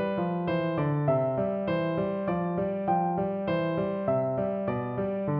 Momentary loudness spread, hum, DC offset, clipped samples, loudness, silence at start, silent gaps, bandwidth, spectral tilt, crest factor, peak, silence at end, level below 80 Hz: 3 LU; none; under 0.1%; under 0.1%; -28 LUFS; 0 s; none; 5.2 kHz; -11.5 dB/octave; 14 dB; -14 dBFS; 0 s; -58 dBFS